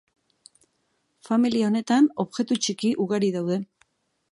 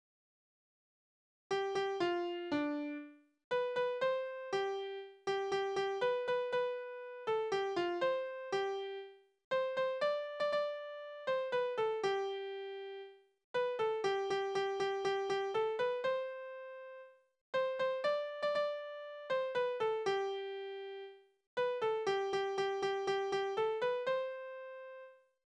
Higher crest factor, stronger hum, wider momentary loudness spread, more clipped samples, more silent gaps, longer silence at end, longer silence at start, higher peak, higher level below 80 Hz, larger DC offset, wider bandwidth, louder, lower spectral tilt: about the same, 16 dB vs 14 dB; neither; second, 8 LU vs 11 LU; neither; second, none vs 3.44-3.51 s, 9.44-9.51 s, 13.44-13.54 s, 17.41-17.53 s, 21.47-21.57 s; first, 0.65 s vs 0.4 s; second, 1.3 s vs 1.5 s; first, -10 dBFS vs -22 dBFS; first, -72 dBFS vs -80 dBFS; neither; first, 11.5 kHz vs 9.8 kHz; first, -24 LUFS vs -37 LUFS; about the same, -5 dB/octave vs -4 dB/octave